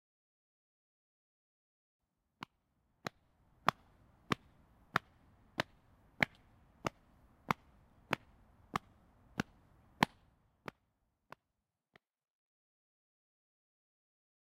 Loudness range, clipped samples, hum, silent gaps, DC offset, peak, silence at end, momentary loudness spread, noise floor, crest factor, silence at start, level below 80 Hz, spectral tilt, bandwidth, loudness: 15 LU; under 0.1%; none; none; under 0.1%; -8 dBFS; 4.45 s; 18 LU; -89 dBFS; 38 dB; 3.05 s; -70 dBFS; -4.5 dB/octave; 15.5 kHz; -41 LUFS